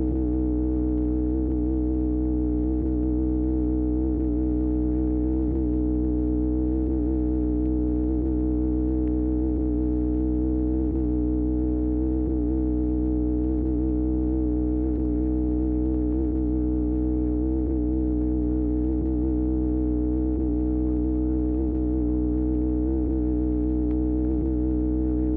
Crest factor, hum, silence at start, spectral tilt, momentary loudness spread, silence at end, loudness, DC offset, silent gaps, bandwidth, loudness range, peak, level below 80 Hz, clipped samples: 10 dB; none; 0 s; -14 dB/octave; 0 LU; 0 s; -25 LUFS; under 0.1%; none; 1.9 kHz; 0 LU; -14 dBFS; -28 dBFS; under 0.1%